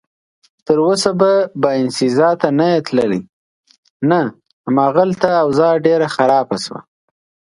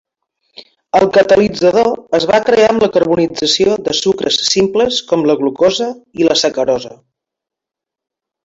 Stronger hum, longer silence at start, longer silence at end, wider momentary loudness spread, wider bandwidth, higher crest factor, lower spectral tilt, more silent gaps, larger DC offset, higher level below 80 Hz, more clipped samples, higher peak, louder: neither; about the same, 0.7 s vs 0.6 s; second, 0.75 s vs 1.5 s; first, 10 LU vs 6 LU; first, 11.5 kHz vs 8 kHz; about the same, 16 dB vs 14 dB; first, -5.5 dB/octave vs -3.5 dB/octave; first, 3.29-3.64 s, 3.78-3.83 s, 3.90-4.00 s, 4.53-4.64 s vs none; neither; second, -58 dBFS vs -48 dBFS; neither; about the same, 0 dBFS vs 0 dBFS; about the same, -15 LUFS vs -13 LUFS